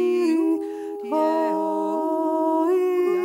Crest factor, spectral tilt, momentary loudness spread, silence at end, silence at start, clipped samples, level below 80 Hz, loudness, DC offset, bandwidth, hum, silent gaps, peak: 10 dB; -5.5 dB/octave; 6 LU; 0 s; 0 s; under 0.1%; -80 dBFS; -23 LUFS; under 0.1%; 14.5 kHz; none; none; -12 dBFS